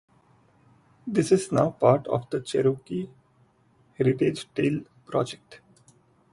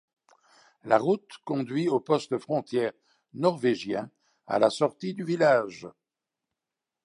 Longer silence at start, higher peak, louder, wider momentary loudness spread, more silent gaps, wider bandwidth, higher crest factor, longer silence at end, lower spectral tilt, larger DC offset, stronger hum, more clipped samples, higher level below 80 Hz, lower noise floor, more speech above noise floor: first, 1.05 s vs 0.85 s; about the same, -4 dBFS vs -6 dBFS; about the same, -26 LUFS vs -27 LUFS; about the same, 12 LU vs 14 LU; neither; about the same, 11.5 kHz vs 11 kHz; about the same, 22 dB vs 22 dB; second, 0.75 s vs 1.15 s; about the same, -6.5 dB/octave vs -6 dB/octave; neither; neither; neither; first, -64 dBFS vs -76 dBFS; second, -62 dBFS vs -88 dBFS; second, 38 dB vs 62 dB